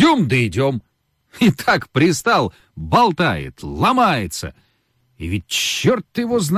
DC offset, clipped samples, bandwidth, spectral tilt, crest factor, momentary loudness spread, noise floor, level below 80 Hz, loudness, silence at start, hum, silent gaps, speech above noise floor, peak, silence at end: under 0.1%; under 0.1%; 16 kHz; -5 dB/octave; 14 dB; 13 LU; -63 dBFS; -40 dBFS; -18 LUFS; 0 s; none; none; 45 dB; -4 dBFS; 0 s